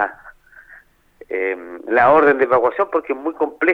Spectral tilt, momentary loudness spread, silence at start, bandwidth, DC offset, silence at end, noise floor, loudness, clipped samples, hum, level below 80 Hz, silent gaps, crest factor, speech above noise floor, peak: -7.5 dB/octave; 12 LU; 0 s; 5.4 kHz; under 0.1%; 0 s; -48 dBFS; -17 LUFS; under 0.1%; none; -56 dBFS; none; 18 dB; 31 dB; 0 dBFS